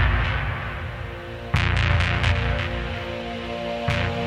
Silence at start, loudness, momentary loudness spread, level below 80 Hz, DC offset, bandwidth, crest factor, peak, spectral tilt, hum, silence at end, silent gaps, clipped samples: 0 s; -25 LUFS; 11 LU; -30 dBFS; under 0.1%; 10 kHz; 18 dB; -6 dBFS; -6 dB/octave; none; 0 s; none; under 0.1%